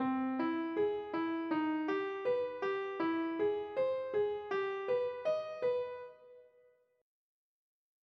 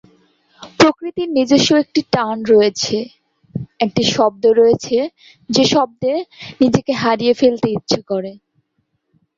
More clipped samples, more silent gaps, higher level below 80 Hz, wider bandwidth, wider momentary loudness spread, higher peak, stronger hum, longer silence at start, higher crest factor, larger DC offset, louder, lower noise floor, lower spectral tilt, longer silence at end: neither; neither; second, -80 dBFS vs -52 dBFS; second, 6.2 kHz vs 7.8 kHz; second, 3 LU vs 11 LU; second, -24 dBFS vs 0 dBFS; neither; second, 0 s vs 0.6 s; about the same, 12 dB vs 16 dB; neither; second, -36 LUFS vs -16 LUFS; about the same, -69 dBFS vs -68 dBFS; first, -6.5 dB/octave vs -4.5 dB/octave; first, 1.6 s vs 1 s